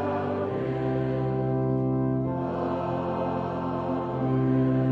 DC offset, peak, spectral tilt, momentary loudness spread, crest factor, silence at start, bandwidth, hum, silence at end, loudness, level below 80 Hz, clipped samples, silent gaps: under 0.1%; -14 dBFS; -10.5 dB/octave; 5 LU; 12 dB; 0 s; 4.8 kHz; none; 0 s; -27 LUFS; -50 dBFS; under 0.1%; none